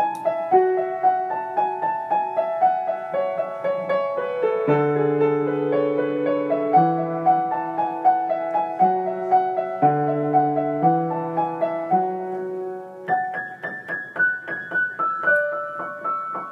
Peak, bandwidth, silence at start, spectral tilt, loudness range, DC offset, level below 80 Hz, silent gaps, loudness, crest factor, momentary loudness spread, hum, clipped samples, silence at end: -4 dBFS; 4.9 kHz; 0 s; -8.5 dB/octave; 4 LU; under 0.1%; -78 dBFS; none; -22 LUFS; 16 dB; 9 LU; none; under 0.1%; 0 s